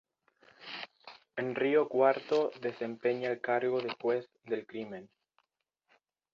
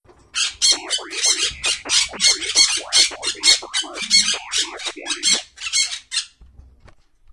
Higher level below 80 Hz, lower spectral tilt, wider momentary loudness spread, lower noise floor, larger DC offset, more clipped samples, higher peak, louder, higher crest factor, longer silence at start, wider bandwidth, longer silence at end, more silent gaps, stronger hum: second, -80 dBFS vs -52 dBFS; first, -6.5 dB/octave vs 2 dB/octave; first, 16 LU vs 10 LU; first, -82 dBFS vs -50 dBFS; neither; neither; second, -14 dBFS vs 0 dBFS; second, -32 LUFS vs -17 LUFS; about the same, 20 dB vs 20 dB; first, 0.6 s vs 0.35 s; second, 7.2 kHz vs 12 kHz; first, 1.25 s vs 0.9 s; neither; neither